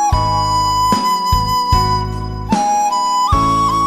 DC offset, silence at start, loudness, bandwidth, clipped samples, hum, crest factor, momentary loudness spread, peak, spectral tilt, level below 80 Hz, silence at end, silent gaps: under 0.1%; 0 s; -15 LUFS; 16 kHz; under 0.1%; none; 14 dB; 5 LU; 0 dBFS; -4.5 dB/octave; -26 dBFS; 0 s; none